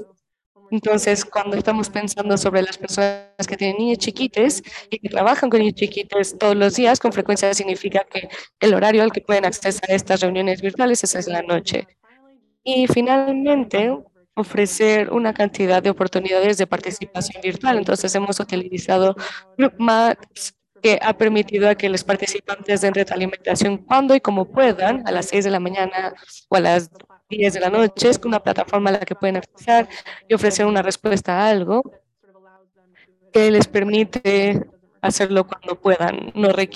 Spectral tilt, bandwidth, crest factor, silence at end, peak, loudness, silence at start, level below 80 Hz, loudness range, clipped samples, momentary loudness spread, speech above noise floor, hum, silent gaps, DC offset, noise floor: -4 dB/octave; 12.5 kHz; 16 dB; 0 s; -2 dBFS; -19 LUFS; 0 s; -56 dBFS; 2 LU; under 0.1%; 9 LU; 38 dB; none; 0.46-0.55 s; under 0.1%; -56 dBFS